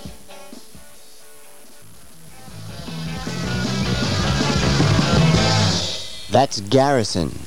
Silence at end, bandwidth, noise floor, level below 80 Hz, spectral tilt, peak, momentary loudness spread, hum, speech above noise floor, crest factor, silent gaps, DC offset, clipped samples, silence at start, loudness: 0 s; 16.5 kHz; -46 dBFS; -36 dBFS; -5 dB/octave; -2 dBFS; 22 LU; none; 28 dB; 18 dB; none; 2%; under 0.1%; 0 s; -19 LUFS